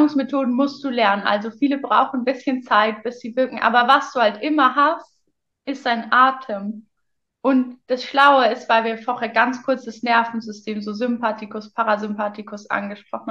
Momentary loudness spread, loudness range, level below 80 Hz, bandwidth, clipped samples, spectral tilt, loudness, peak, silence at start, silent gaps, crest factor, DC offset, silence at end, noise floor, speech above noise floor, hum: 14 LU; 4 LU; -74 dBFS; 8 kHz; under 0.1%; -5 dB/octave; -19 LUFS; -2 dBFS; 0 s; none; 18 dB; under 0.1%; 0 s; -76 dBFS; 56 dB; none